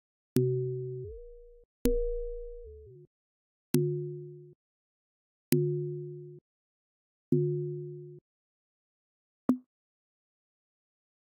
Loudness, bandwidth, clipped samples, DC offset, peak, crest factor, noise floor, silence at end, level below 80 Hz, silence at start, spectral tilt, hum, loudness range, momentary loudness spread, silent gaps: -33 LUFS; 12 kHz; under 0.1%; under 0.1%; -4 dBFS; 32 dB; under -90 dBFS; 1.8 s; -46 dBFS; 0.35 s; -7.5 dB/octave; none; 4 LU; 20 LU; 1.65-1.85 s, 3.07-3.74 s, 4.55-5.52 s, 6.41-7.32 s, 8.21-9.49 s